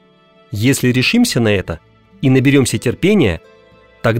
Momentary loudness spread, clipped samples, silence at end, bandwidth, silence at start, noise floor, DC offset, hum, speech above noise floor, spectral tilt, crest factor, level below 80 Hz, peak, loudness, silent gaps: 15 LU; under 0.1%; 0 s; 16.5 kHz; 0.5 s; -49 dBFS; under 0.1%; none; 36 dB; -5.5 dB/octave; 14 dB; -42 dBFS; -2 dBFS; -14 LUFS; none